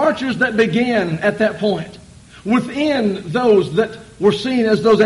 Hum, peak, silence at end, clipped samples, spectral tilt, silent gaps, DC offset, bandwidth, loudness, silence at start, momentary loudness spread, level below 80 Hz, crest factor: none; -2 dBFS; 0 s; under 0.1%; -6 dB/octave; none; under 0.1%; 11.5 kHz; -17 LUFS; 0 s; 6 LU; -50 dBFS; 14 dB